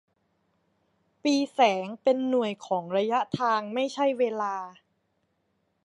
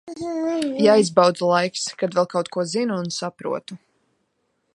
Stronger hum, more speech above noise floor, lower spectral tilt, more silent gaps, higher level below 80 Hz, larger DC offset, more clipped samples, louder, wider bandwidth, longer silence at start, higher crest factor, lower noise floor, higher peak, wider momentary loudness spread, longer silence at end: neither; about the same, 48 dB vs 50 dB; about the same, -5 dB/octave vs -4.5 dB/octave; neither; about the same, -74 dBFS vs -70 dBFS; neither; neither; second, -27 LUFS vs -21 LUFS; about the same, 11 kHz vs 11.5 kHz; first, 1.25 s vs 0.05 s; about the same, 18 dB vs 20 dB; about the same, -74 dBFS vs -71 dBFS; second, -10 dBFS vs -2 dBFS; second, 8 LU vs 13 LU; first, 1.15 s vs 1 s